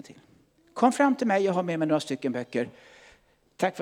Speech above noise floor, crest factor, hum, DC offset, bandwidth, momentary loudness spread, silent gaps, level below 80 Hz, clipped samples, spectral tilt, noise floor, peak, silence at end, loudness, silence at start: 36 dB; 20 dB; none; under 0.1%; 15 kHz; 10 LU; none; -74 dBFS; under 0.1%; -5.5 dB/octave; -61 dBFS; -8 dBFS; 0 s; -26 LUFS; 0.1 s